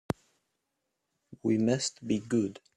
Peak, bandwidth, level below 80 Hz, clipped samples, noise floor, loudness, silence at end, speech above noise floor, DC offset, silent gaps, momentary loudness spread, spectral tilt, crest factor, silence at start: -12 dBFS; 11.5 kHz; -66 dBFS; under 0.1%; -83 dBFS; -31 LUFS; 0.25 s; 53 dB; under 0.1%; none; 10 LU; -5 dB/octave; 22 dB; 1.3 s